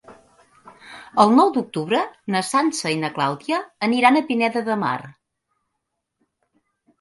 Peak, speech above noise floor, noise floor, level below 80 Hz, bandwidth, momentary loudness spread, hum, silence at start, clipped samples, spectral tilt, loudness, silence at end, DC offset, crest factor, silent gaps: 0 dBFS; 59 dB; -78 dBFS; -68 dBFS; 11.5 kHz; 10 LU; none; 0.1 s; under 0.1%; -4.5 dB/octave; -20 LUFS; 1.9 s; under 0.1%; 22 dB; none